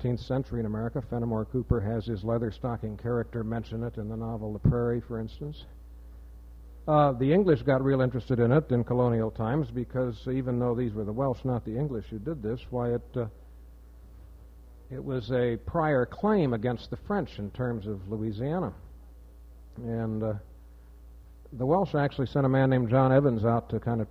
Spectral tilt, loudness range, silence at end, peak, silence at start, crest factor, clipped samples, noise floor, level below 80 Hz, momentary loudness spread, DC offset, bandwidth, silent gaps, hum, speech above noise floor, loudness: -10 dB/octave; 9 LU; 0 s; -10 dBFS; 0 s; 18 dB; under 0.1%; -50 dBFS; -46 dBFS; 12 LU; under 0.1%; 6 kHz; none; none; 22 dB; -29 LUFS